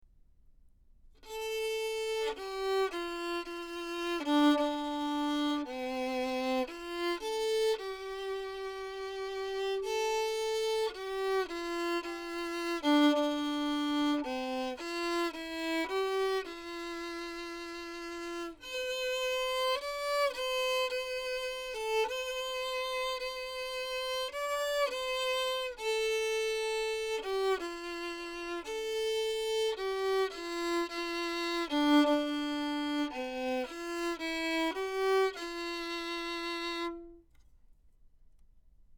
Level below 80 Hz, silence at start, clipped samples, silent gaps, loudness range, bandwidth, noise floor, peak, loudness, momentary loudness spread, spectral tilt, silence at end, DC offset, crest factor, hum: -62 dBFS; 0.5 s; under 0.1%; none; 4 LU; 19 kHz; -61 dBFS; -16 dBFS; -33 LUFS; 8 LU; -2 dB/octave; 0.05 s; under 0.1%; 18 dB; none